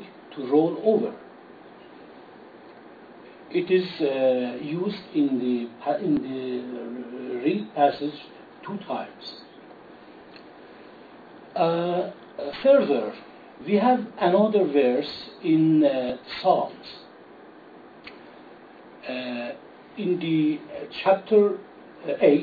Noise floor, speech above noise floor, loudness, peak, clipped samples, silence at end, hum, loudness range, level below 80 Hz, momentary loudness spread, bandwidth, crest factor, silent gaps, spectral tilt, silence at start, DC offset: -47 dBFS; 24 dB; -24 LUFS; -6 dBFS; under 0.1%; 0 s; none; 9 LU; -70 dBFS; 22 LU; 4.9 kHz; 20 dB; none; -9 dB/octave; 0 s; under 0.1%